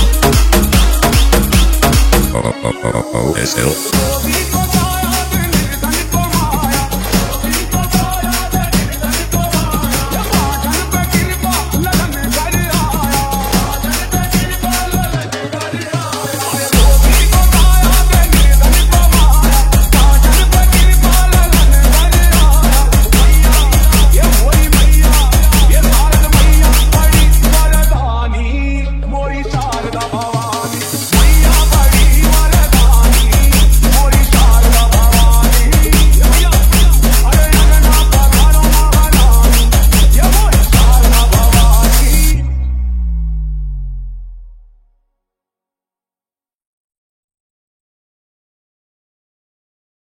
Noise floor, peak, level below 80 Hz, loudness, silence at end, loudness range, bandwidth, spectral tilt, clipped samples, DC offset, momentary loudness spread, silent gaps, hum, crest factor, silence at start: under -90 dBFS; 0 dBFS; -10 dBFS; -11 LUFS; 5.6 s; 6 LU; 17 kHz; -4 dB/octave; 0.2%; under 0.1%; 8 LU; none; none; 10 dB; 0 s